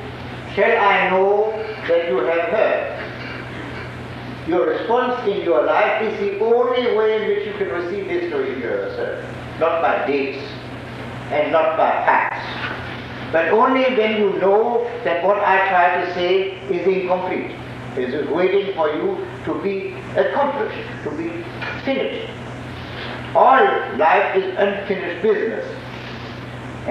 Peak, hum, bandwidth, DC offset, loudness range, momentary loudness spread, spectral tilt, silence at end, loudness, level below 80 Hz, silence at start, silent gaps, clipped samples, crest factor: -2 dBFS; none; 9.2 kHz; under 0.1%; 5 LU; 15 LU; -6.5 dB/octave; 0 s; -19 LUFS; -50 dBFS; 0 s; none; under 0.1%; 18 dB